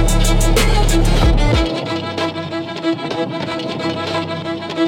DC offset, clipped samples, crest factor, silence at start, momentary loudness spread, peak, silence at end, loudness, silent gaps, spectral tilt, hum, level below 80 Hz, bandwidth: under 0.1%; under 0.1%; 12 dB; 0 s; 8 LU; -2 dBFS; 0 s; -18 LUFS; none; -5 dB/octave; none; -18 dBFS; 17 kHz